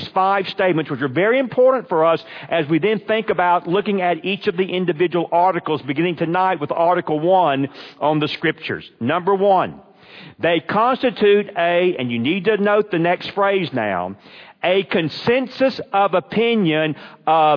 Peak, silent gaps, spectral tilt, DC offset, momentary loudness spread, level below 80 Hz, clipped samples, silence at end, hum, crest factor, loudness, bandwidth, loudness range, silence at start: -4 dBFS; none; -8 dB/octave; under 0.1%; 7 LU; -64 dBFS; under 0.1%; 0 s; none; 14 dB; -18 LUFS; 5.4 kHz; 2 LU; 0 s